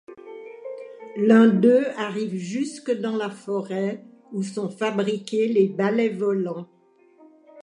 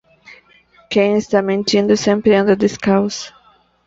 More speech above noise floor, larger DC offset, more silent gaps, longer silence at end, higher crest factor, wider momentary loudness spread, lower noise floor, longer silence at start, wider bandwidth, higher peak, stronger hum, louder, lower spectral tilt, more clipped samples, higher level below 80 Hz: second, 32 dB vs 38 dB; neither; neither; second, 0 s vs 0.55 s; about the same, 20 dB vs 16 dB; first, 21 LU vs 8 LU; about the same, -54 dBFS vs -53 dBFS; second, 0.1 s vs 0.3 s; first, 10.5 kHz vs 7.8 kHz; about the same, -4 dBFS vs -2 dBFS; neither; second, -23 LUFS vs -15 LUFS; first, -6.5 dB/octave vs -5 dB/octave; neither; second, -78 dBFS vs -54 dBFS